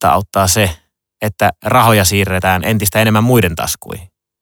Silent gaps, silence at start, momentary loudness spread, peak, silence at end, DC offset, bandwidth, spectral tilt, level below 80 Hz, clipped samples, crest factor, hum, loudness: none; 0 s; 13 LU; 0 dBFS; 0.35 s; under 0.1%; 19.5 kHz; -4.5 dB/octave; -38 dBFS; under 0.1%; 14 dB; none; -13 LUFS